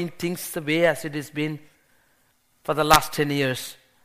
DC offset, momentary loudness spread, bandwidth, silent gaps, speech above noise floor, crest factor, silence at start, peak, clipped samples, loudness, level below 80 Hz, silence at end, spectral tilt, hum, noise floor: under 0.1%; 14 LU; 15.5 kHz; none; 41 dB; 26 dB; 0 s; 0 dBFS; under 0.1%; -23 LUFS; -46 dBFS; 0.3 s; -4 dB/octave; none; -64 dBFS